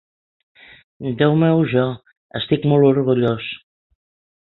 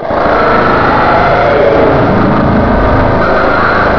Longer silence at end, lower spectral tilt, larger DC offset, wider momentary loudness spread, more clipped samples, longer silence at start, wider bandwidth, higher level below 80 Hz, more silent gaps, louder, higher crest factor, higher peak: first, 0.85 s vs 0 s; first, -11 dB/octave vs -8 dB/octave; second, under 0.1% vs 5%; first, 16 LU vs 2 LU; second, under 0.1% vs 0.3%; first, 1 s vs 0 s; second, 4.2 kHz vs 5.4 kHz; second, -54 dBFS vs -22 dBFS; first, 2.17-2.29 s vs none; second, -18 LUFS vs -8 LUFS; first, 18 dB vs 8 dB; about the same, -2 dBFS vs 0 dBFS